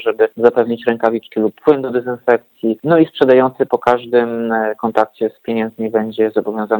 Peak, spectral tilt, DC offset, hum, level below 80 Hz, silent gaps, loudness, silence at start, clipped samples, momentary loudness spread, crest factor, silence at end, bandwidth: 0 dBFS; -8 dB/octave; under 0.1%; none; -60 dBFS; none; -16 LUFS; 0 s; under 0.1%; 7 LU; 16 dB; 0 s; 19.5 kHz